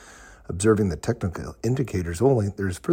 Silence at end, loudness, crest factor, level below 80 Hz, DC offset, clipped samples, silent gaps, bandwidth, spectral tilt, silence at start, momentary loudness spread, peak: 0 s; -24 LUFS; 16 dB; -44 dBFS; under 0.1%; under 0.1%; none; 16 kHz; -6.5 dB/octave; 0 s; 9 LU; -8 dBFS